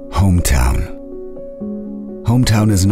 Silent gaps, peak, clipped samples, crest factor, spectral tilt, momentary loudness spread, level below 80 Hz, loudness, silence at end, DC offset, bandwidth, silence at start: none; -2 dBFS; under 0.1%; 14 dB; -5.5 dB/octave; 18 LU; -22 dBFS; -16 LUFS; 0 s; under 0.1%; 16 kHz; 0 s